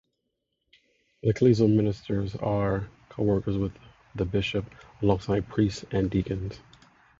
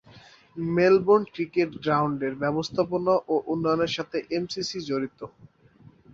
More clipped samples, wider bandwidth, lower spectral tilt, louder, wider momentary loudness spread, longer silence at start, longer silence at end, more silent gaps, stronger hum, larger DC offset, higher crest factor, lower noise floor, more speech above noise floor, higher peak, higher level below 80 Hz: neither; about the same, 7.6 kHz vs 7.6 kHz; first, -8 dB/octave vs -6 dB/octave; about the same, -27 LUFS vs -25 LUFS; about the same, 12 LU vs 10 LU; first, 1.25 s vs 0.15 s; second, 0.6 s vs 0.85 s; neither; neither; neither; about the same, 18 dB vs 18 dB; first, -80 dBFS vs -54 dBFS; first, 54 dB vs 29 dB; about the same, -8 dBFS vs -8 dBFS; first, -46 dBFS vs -62 dBFS